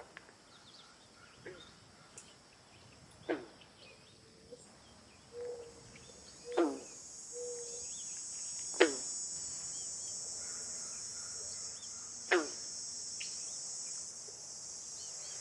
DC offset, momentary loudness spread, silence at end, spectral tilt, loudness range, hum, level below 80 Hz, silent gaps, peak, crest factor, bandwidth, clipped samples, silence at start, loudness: under 0.1%; 23 LU; 0 s; -1 dB/octave; 12 LU; none; -76 dBFS; none; -8 dBFS; 34 dB; 11.5 kHz; under 0.1%; 0 s; -39 LUFS